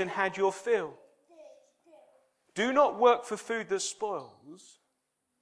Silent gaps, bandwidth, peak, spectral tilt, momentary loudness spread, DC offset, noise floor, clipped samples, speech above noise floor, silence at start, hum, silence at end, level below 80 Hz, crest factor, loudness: none; 11 kHz; -10 dBFS; -3 dB/octave; 16 LU; under 0.1%; -80 dBFS; under 0.1%; 51 dB; 0 s; none; 0.85 s; -80 dBFS; 22 dB; -29 LUFS